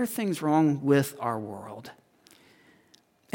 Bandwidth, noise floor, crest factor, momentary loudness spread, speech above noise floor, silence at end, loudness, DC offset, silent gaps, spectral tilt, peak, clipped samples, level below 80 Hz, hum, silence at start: 17 kHz; -63 dBFS; 20 dB; 20 LU; 36 dB; 1.4 s; -26 LUFS; under 0.1%; none; -6.5 dB/octave; -10 dBFS; under 0.1%; -76 dBFS; none; 0 s